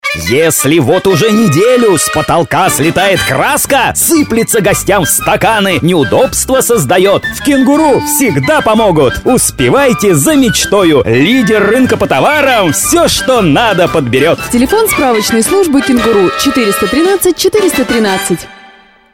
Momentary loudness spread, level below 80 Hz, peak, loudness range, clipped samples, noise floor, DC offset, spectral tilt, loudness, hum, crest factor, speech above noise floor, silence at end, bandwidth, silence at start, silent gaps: 2 LU; -34 dBFS; 0 dBFS; 1 LU; under 0.1%; -39 dBFS; under 0.1%; -4 dB/octave; -8 LUFS; none; 8 dB; 31 dB; 0.6 s; 18 kHz; 0.05 s; none